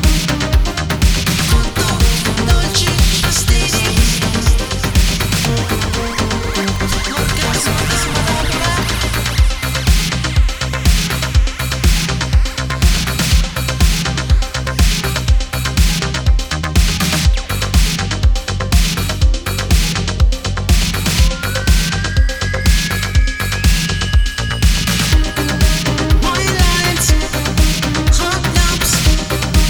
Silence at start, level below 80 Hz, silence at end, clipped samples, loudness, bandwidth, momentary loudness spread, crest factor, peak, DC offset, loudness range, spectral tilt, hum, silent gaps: 0 s; -16 dBFS; 0 s; under 0.1%; -15 LUFS; over 20 kHz; 4 LU; 14 dB; 0 dBFS; under 0.1%; 2 LU; -4 dB/octave; none; none